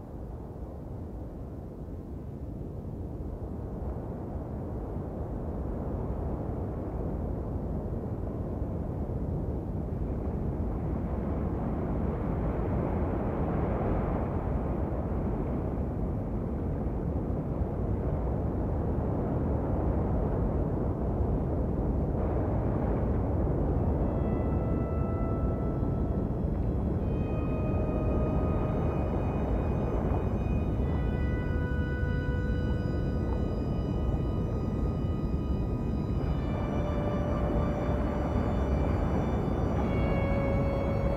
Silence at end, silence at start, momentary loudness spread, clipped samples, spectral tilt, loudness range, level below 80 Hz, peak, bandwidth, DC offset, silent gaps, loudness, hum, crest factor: 0 s; 0 s; 8 LU; under 0.1%; -10 dB/octave; 6 LU; -34 dBFS; -16 dBFS; 6.2 kHz; under 0.1%; none; -31 LUFS; none; 14 dB